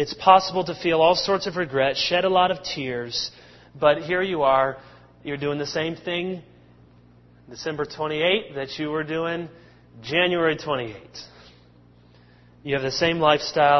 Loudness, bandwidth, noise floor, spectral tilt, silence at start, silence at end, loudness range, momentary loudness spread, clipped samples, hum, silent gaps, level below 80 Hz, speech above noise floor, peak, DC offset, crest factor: -23 LUFS; 6.2 kHz; -53 dBFS; -4.5 dB/octave; 0 s; 0 s; 6 LU; 15 LU; under 0.1%; 60 Hz at -55 dBFS; none; -56 dBFS; 30 dB; -2 dBFS; under 0.1%; 22 dB